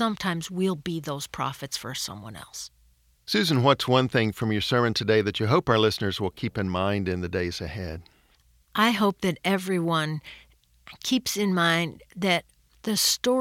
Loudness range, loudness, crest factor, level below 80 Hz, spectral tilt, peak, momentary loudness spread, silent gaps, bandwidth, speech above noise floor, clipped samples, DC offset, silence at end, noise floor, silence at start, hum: 5 LU; -25 LUFS; 20 dB; -54 dBFS; -4.5 dB/octave; -6 dBFS; 14 LU; none; 17 kHz; 36 dB; under 0.1%; under 0.1%; 0 s; -62 dBFS; 0 s; none